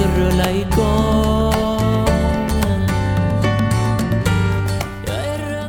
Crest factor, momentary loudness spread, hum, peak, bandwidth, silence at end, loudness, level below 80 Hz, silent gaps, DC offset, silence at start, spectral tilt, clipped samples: 14 dB; 6 LU; none; -2 dBFS; 18 kHz; 0 s; -18 LUFS; -24 dBFS; none; under 0.1%; 0 s; -6.5 dB/octave; under 0.1%